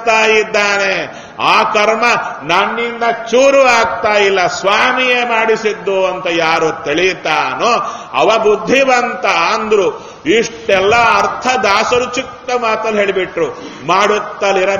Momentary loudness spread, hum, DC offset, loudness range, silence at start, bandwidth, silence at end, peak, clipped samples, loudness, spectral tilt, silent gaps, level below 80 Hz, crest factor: 7 LU; none; under 0.1%; 2 LU; 0 s; 11 kHz; 0 s; 0 dBFS; 0.1%; -12 LUFS; -3 dB/octave; none; -48 dBFS; 12 dB